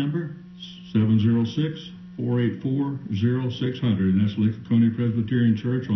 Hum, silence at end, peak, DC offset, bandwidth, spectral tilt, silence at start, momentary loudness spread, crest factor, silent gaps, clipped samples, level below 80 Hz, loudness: none; 0 s; -10 dBFS; under 0.1%; 6.2 kHz; -9 dB/octave; 0 s; 13 LU; 14 dB; none; under 0.1%; -50 dBFS; -23 LUFS